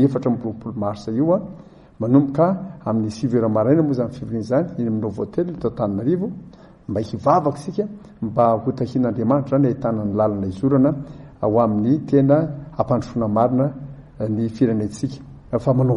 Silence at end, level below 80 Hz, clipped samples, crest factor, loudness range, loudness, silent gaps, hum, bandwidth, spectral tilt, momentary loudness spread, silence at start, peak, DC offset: 0 s; -50 dBFS; under 0.1%; 16 dB; 3 LU; -21 LUFS; none; none; 10.5 kHz; -9.5 dB/octave; 11 LU; 0 s; -4 dBFS; under 0.1%